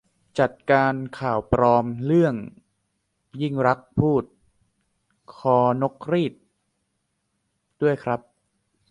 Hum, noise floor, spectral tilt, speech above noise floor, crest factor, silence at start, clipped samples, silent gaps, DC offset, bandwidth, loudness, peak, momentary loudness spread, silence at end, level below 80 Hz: none; -75 dBFS; -8.5 dB/octave; 53 dB; 20 dB; 0.35 s; under 0.1%; none; under 0.1%; 10.5 kHz; -23 LUFS; -4 dBFS; 11 LU; 0.75 s; -50 dBFS